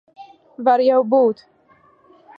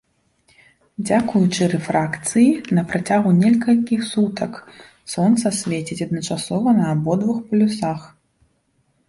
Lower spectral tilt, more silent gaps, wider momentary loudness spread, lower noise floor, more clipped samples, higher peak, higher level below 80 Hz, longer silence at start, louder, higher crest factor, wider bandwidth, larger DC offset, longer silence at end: first, -7.5 dB/octave vs -6 dB/octave; neither; second, 7 LU vs 12 LU; second, -55 dBFS vs -65 dBFS; neither; about the same, -4 dBFS vs -4 dBFS; second, -76 dBFS vs -56 dBFS; second, 0.2 s vs 1 s; about the same, -17 LUFS vs -19 LUFS; about the same, 16 dB vs 16 dB; second, 5.4 kHz vs 11.5 kHz; neither; about the same, 1.05 s vs 1 s